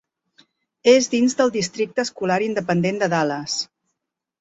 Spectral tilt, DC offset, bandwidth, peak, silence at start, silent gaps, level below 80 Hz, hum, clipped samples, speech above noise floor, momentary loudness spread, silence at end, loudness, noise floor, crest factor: -4.5 dB/octave; under 0.1%; 8.2 kHz; -2 dBFS; 0.85 s; none; -62 dBFS; none; under 0.1%; 61 dB; 9 LU; 0.75 s; -20 LUFS; -80 dBFS; 20 dB